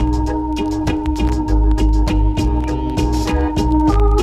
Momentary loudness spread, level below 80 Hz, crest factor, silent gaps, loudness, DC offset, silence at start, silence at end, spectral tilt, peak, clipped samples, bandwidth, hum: 5 LU; -18 dBFS; 12 dB; none; -18 LUFS; under 0.1%; 0 s; 0 s; -7 dB/octave; -2 dBFS; under 0.1%; 9.4 kHz; none